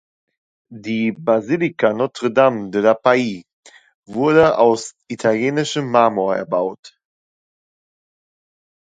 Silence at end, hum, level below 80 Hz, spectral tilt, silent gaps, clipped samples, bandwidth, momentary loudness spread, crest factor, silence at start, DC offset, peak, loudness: 1.95 s; none; -60 dBFS; -5.5 dB/octave; 3.53-3.63 s, 3.94-4.03 s, 6.79-6.83 s; under 0.1%; 9.4 kHz; 12 LU; 18 dB; 0.7 s; under 0.1%; 0 dBFS; -17 LUFS